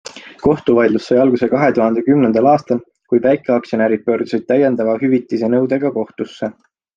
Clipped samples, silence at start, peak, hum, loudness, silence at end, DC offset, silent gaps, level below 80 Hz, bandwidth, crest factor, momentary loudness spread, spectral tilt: under 0.1%; 0.05 s; -2 dBFS; none; -15 LUFS; 0.45 s; under 0.1%; none; -52 dBFS; 7.8 kHz; 14 dB; 9 LU; -7.5 dB/octave